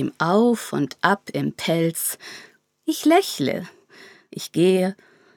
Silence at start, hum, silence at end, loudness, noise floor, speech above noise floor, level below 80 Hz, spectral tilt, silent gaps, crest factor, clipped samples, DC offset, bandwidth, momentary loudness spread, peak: 0 s; none; 0.45 s; -22 LUFS; -49 dBFS; 27 dB; -72 dBFS; -5 dB/octave; none; 20 dB; under 0.1%; under 0.1%; over 20 kHz; 16 LU; -2 dBFS